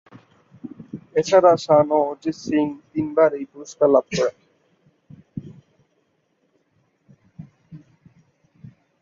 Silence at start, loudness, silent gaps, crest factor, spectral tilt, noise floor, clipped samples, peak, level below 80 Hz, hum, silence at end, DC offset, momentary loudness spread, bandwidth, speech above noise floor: 0.65 s; -19 LUFS; none; 20 dB; -6 dB/octave; -68 dBFS; under 0.1%; -4 dBFS; -62 dBFS; none; 1.25 s; under 0.1%; 23 LU; 7.6 kHz; 49 dB